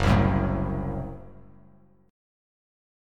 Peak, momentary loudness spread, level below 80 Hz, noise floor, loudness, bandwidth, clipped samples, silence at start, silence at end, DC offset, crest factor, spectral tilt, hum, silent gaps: -8 dBFS; 17 LU; -36 dBFS; -57 dBFS; -26 LUFS; 10.5 kHz; under 0.1%; 0 s; 1.8 s; under 0.1%; 20 dB; -7.5 dB/octave; none; none